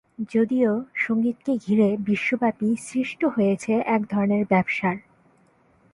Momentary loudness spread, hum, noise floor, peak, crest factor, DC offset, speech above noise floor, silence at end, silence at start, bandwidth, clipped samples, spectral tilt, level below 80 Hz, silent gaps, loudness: 5 LU; none; -60 dBFS; -8 dBFS; 16 dB; under 0.1%; 37 dB; 0.95 s; 0.2 s; 11.5 kHz; under 0.1%; -7 dB/octave; -64 dBFS; none; -23 LUFS